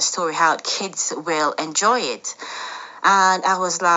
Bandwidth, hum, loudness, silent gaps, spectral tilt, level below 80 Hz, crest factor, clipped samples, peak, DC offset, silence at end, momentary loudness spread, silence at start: 8.2 kHz; none; -19 LUFS; none; -1 dB/octave; -80 dBFS; 18 dB; under 0.1%; -2 dBFS; under 0.1%; 0 s; 14 LU; 0 s